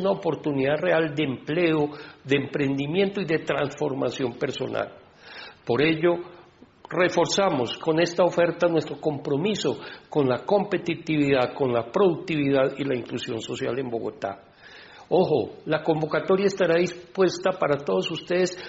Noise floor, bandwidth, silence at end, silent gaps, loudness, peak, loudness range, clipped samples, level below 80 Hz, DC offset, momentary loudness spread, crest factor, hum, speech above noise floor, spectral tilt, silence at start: -51 dBFS; 8 kHz; 0 s; none; -25 LUFS; -8 dBFS; 4 LU; under 0.1%; -62 dBFS; under 0.1%; 9 LU; 16 dB; none; 27 dB; -4.5 dB/octave; 0 s